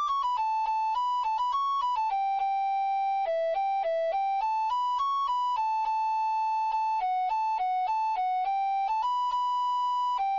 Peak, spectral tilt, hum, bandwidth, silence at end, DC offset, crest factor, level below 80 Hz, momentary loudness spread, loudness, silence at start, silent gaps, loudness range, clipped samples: -22 dBFS; 4 dB/octave; none; 7.4 kHz; 0 s; under 0.1%; 6 dB; -66 dBFS; 1 LU; -28 LUFS; 0 s; none; 0 LU; under 0.1%